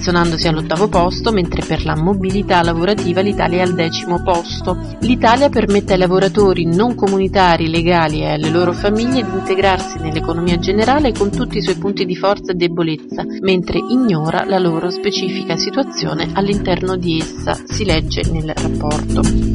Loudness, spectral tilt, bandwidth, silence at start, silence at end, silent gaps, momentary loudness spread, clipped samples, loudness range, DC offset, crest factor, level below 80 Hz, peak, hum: -16 LUFS; -6 dB/octave; 11 kHz; 0 s; 0 s; none; 7 LU; under 0.1%; 4 LU; under 0.1%; 14 dB; -28 dBFS; 0 dBFS; none